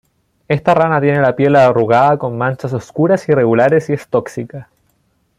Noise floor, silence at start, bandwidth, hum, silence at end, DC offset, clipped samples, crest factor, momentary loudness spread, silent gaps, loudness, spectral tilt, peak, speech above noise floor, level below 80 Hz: -61 dBFS; 0.5 s; 11.5 kHz; none; 0.75 s; under 0.1%; under 0.1%; 12 dB; 11 LU; none; -13 LUFS; -8 dB/octave; -2 dBFS; 48 dB; -54 dBFS